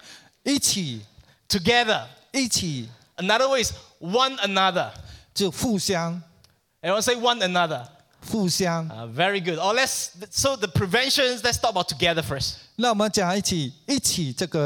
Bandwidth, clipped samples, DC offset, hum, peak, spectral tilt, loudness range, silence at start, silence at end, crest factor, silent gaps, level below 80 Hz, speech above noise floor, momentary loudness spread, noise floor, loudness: 19 kHz; under 0.1%; under 0.1%; none; -4 dBFS; -3 dB/octave; 2 LU; 0.05 s; 0 s; 20 dB; none; -52 dBFS; 36 dB; 11 LU; -60 dBFS; -23 LUFS